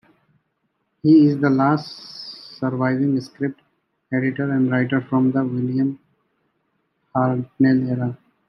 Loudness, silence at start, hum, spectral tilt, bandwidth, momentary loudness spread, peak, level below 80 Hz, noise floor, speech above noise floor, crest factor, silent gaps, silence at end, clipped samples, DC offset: -20 LUFS; 1.05 s; none; -9 dB/octave; 6 kHz; 13 LU; -4 dBFS; -66 dBFS; -72 dBFS; 53 dB; 16 dB; none; 0.35 s; under 0.1%; under 0.1%